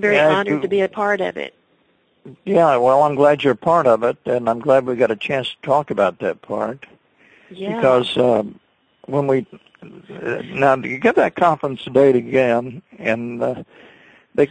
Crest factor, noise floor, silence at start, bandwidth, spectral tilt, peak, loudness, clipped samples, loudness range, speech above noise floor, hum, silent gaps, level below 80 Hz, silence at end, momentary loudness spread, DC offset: 16 dB; -61 dBFS; 0 s; 9.2 kHz; -6.5 dB/octave; -2 dBFS; -18 LUFS; under 0.1%; 4 LU; 43 dB; none; none; -60 dBFS; 0.05 s; 12 LU; under 0.1%